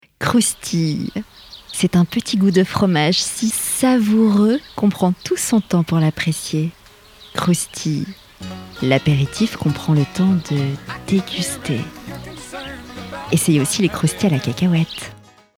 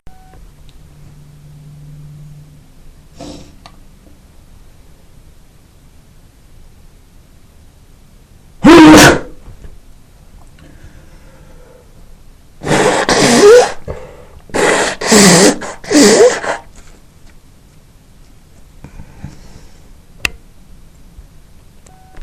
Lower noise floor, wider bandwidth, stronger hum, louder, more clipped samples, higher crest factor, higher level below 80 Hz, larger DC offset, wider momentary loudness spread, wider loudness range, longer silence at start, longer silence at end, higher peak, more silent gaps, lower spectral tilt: about the same, -44 dBFS vs -42 dBFS; second, 17.5 kHz vs over 20 kHz; neither; second, -18 LUFS vs -8 LUFS; second, under 0.1% vs 1%; about the same, 18 dB vs 14 dB; second, -48 dBFS vs -36 dBFS; neither; second, 15 LU vs 29 LU; second, 5 LU vs 19 LU; first, 0.2 s vs 0.05 s; first, 0.4 s vs 0 s; about the same, 0 dBFS vs 0 dBFS; neither; first, -5 dB/octave vs -3.5 dB/octave